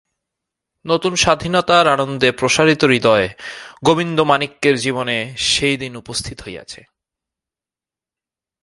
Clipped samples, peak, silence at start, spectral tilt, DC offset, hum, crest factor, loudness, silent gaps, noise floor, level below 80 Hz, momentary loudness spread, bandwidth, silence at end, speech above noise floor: under 0.1%; 0 dBFS; 0.85 s; -3.5 dB/octave; under 0.1%; none; 18 dB; -16 LUFS; none; -90 dBFS; -46 dBFS; 18 LU; 11.5 kHz; 1.85 s; 73 dB